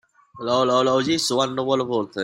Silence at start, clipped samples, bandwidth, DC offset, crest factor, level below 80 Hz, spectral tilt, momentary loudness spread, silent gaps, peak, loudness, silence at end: 0.35 s; under 0.1%; 16 kHz; under 0.1%; 16 dB; -62 dBFS; -4 dB/octave; 6 LU; none; -6 dBFS; -21 LUFS; 0 s